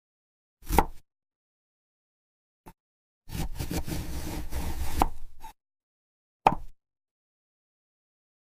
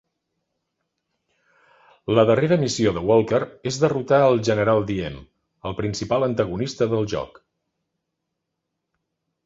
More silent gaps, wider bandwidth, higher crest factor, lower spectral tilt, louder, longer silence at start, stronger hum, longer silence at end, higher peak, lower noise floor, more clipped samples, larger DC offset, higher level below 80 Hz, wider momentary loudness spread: first, 1.36-2.64 s, 2.80-3.21 s, 5.83-6.40 s vs none; first, 16 kHz vs 8 kHz; first, 26 dB vs 20 dB; about the same, -5 dB/octave vs -6 dB/octave; second, -31 LUFS vs -21 LUFS; second, 0.6 s vs 2.1 s; neither; second, 1.8 s vs 2.2 s; second, -6 dBFS vs -2 dBFS; first, under -90 dBFS vs -80 dBFS; neither; neither; first, -38 dBFS vs -50 dBFS; first, 19 LU vs 14 LU